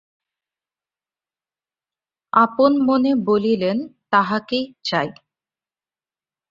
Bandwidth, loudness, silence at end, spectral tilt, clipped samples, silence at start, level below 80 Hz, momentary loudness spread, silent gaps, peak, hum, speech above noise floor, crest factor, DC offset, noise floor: 7.4 kHz; -19 LUFS; 1.4 s; -6.5 dB/octave; under 0.1%; 2.35 s; -64 dBFS; 8 LU; none; -2 dBFS; none; over 72 dB; 20 dB; under 0.1%; under -90 dBFS